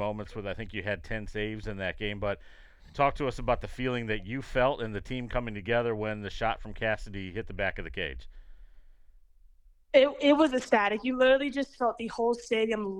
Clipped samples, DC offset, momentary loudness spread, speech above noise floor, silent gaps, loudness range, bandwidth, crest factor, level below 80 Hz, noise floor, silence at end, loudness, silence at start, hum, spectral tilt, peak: under 0.1%; under 0.1%; 13 LU; 28 dB; none; 9 LU; 11 kHz; 22 dB; -46 dBFS; -57 dBFS; 0 s; -30 LUFS; 0 s; none; -6 dB/octave; -8 dBFS